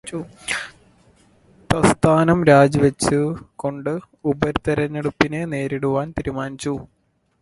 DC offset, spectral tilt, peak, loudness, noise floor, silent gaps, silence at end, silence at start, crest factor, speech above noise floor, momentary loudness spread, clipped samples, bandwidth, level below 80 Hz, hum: under 0.1%; -6 dB/octave; 0 dBFS; -20 LUFS; -55 dBFS; none; 0.55 s; 0.05 s; 20 dB; 35 dB; 14 LU; under 0.1%; 11.5 kHz; -44 dBFS; none